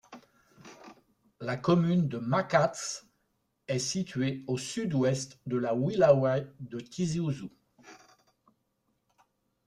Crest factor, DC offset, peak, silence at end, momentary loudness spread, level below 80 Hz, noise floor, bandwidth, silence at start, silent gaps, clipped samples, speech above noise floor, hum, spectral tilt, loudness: 22 dB; under 0.1%; -8 dBFS; 1.7 s; 16 LU; -66 dBFS; -77 dBFS; 12 kHz; 0.1 s; none; under 0.1%; 48 dB; none; -6 dB/octave; -29 LUFS